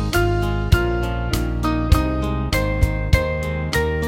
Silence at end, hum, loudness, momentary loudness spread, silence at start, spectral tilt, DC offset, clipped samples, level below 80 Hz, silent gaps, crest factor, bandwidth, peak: 0 s; none; -21 LUFS; 4 LU; 0 s; -6 dB/octave; under 0.1%; under 0.1%; -24 dBFS; none; 18 dB; 17 kHz; 0 dBFS